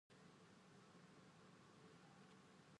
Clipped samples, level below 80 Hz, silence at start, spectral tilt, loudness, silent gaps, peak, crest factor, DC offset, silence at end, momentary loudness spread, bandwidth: under 0.1%; under -90 dBFS; 0.1 s; -5 dB/octave; -67 LUFS; none; -54 dBFS; 12 dB; under 0.1%; 0 s; 1 LU; 10.5 kHz